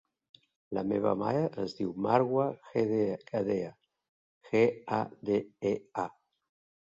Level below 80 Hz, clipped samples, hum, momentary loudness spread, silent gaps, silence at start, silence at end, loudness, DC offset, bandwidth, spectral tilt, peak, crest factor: -68 dBFS; under 0.1%; none; 8 LU; 4.09-4.41 s; 0.7 s; 0.75 s; -31 LUFS; under 0.1%; 7.6 kHz; -8 dB/octave; -10 dBFS; 22 dB